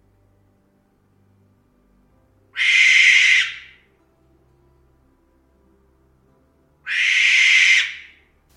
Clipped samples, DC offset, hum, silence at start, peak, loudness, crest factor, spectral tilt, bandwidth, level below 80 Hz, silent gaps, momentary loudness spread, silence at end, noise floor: under 0.1%; under 0.1%; none; 2.55 s; -2 dBFS; -13 LUFS; 18 dB; 3.5 dB/octave; 12.5 kHz; -64 dBFS; none; 23 LU; 0.55 s; -61 dBFS